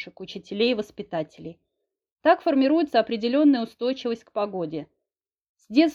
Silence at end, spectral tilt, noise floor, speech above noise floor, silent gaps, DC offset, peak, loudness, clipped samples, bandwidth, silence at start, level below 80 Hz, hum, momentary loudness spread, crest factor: 0 s; -6 dB/octave; -88 dBFS; 65 dB; 2.12-2.16 s, 5.49-5.55 s; under 0.1%; -6 dBFS; -24 LUFS; under 0.1%; 7.2 kHz; 0 s; -68 dBFS; none; 16 LU; 18 dB